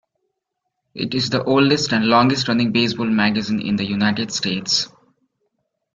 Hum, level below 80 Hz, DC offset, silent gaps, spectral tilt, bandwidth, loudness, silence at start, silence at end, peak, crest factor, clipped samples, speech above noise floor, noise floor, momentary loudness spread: none; -56 dBFS; under 0.1%; none; -4.5 dB/octave; 7.8 kHz; -18 LUFS; 0.95 s; 1.05 s; -2 dBFS; 18 dB; under 0.1%; 59 dB; -77 dBFS; 6 LU